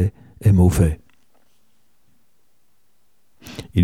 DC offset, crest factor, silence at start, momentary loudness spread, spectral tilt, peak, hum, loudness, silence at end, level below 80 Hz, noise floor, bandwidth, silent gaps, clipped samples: 0.3%; 18 dB; 0 s; 21 LU; -7.5 dB/octave; -2 dBFS; none; -18 LUFS; 0 s; -34 dBFS; -68 dBFS; 15.5 kHz; none; under 0.1%